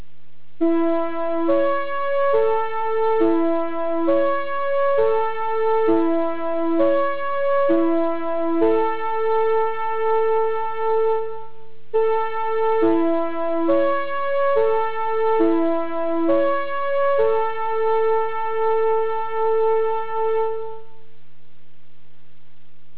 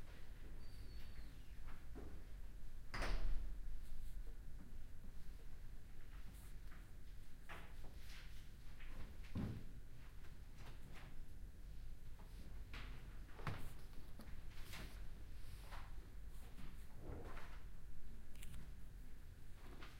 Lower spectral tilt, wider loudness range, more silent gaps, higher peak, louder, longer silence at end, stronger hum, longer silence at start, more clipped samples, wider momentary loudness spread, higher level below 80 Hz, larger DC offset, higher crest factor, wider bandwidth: first, -9.5 dB/octave vs -5.5 dB/octave; second, 2 LU vs 6 LU; neither; first, -8 dBFS vs -28 dBFS; first, -21 LUFS vs -57 LUFS; about the same, 0 s vs 0 s; neither; first, 0.6 s vs 0 s; neither; second, 5 LU vs 10 LU; second, -68 dBFS vs -52 dBFS; first, 6% vs under 0.1%; second, 12 dB vs 18 dB; second, 4 kHz vs 15.5 kHz